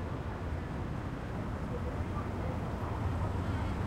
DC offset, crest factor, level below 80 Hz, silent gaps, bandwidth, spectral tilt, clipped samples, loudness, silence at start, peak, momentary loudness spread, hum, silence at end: under 0.1%; 14 dB; -44 dBFS; none; 13 kHz; -8 dB/octave; under 0.1%; -37 LUFS; 0 s; -22 dBFS; 4 LU; none; 0 s